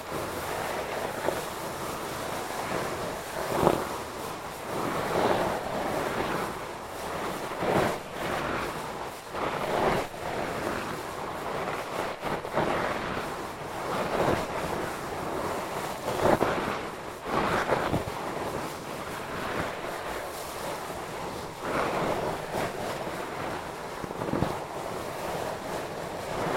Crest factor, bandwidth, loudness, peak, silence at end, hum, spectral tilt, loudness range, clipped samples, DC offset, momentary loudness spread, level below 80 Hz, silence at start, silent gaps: 28 dB; 16.5 kHz; -31 LUFS; -4 dBFS; 0 s; none; -4.5 dB/octave; 4 LU; under 0.1%; under 0.1%; 9 LU; -52 dBFS; 0 s; none